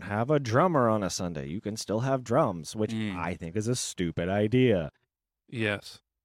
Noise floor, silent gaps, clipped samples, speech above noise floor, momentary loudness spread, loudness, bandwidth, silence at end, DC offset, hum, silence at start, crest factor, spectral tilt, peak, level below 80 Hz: -72 dBFS; none; under 0.1%; 44 dB; 11 LU; -28 LUFS; 16 kHz; 0.3 s; under 0.1%; none; 0 s; 18 dB; -5.5 dB/octave; -10 dBFS; -58 dBFS